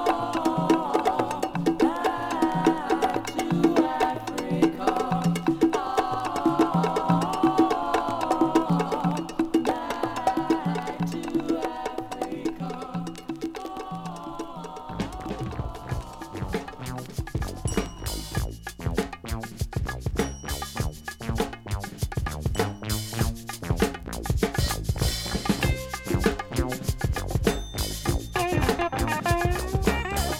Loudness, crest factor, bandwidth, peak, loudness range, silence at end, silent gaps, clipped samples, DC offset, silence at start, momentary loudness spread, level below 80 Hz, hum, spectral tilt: -27 LUFS; 20 dB; 17 kHz; -6 dBFS; 10 LU; 0 s; none; under 0.1%; under 0.1%; 0 s; 11 LU; -36 dBFS; none; -5.5 dB/octave